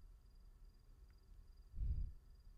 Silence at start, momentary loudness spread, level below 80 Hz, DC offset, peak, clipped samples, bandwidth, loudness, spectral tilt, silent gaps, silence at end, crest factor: 0 s; 21 LU; -50 dBFS; under 0.1%; -34 dBFS; under 0.1%; 5.2 kHz; -50 LUFS; -8 dB/octave; none; 0 s; 16 dB